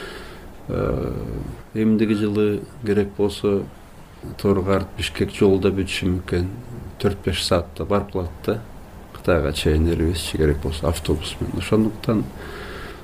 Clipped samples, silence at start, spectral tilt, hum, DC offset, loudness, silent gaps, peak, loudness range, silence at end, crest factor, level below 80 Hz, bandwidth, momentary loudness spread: under 0.1%; 0 s; -6 dB/octave; none; under 0.1%; -22 LUFS; none; -6 dBFS; 2 LU; 0 s; 16 dB; -34 dBFS; 15.5 kHz; 15 LU